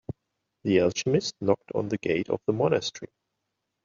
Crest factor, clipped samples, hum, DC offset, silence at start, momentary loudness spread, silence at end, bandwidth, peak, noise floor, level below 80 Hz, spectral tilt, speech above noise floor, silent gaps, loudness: 20 dB; under 0.1%; none; under 0.1%; 0.65 s; 18 LU; 0.8 s; 7.6 kHz; -8 dBFS; -81 dBFS; -64 dBFS; -5 dB/octave; 56 dB; none; -27 LUFS